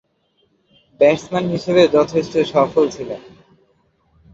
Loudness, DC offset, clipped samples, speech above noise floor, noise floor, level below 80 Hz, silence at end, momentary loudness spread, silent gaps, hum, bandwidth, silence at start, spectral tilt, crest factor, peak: -16 LUFS; under 0.1%; under 0.1%; 47 dB; -63 dBFS; -54 dBFS; 1.15 s; 13 LU; none; none; 7.8 kHz; 1 s; -6 dB/octave; 18 dB; -2 dBFS